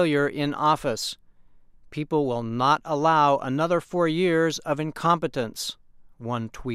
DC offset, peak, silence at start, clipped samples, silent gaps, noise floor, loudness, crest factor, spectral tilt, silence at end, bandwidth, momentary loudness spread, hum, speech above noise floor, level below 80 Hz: under 0.1%; -8 dBFS; 0 s; under 0.1%; none; -51 dBFS; -24 LUFS; 16 dB; -5.5 dB/octave; 0 s; 15.5 kHz; 11 LU; none; 27 dB; -56 dBFS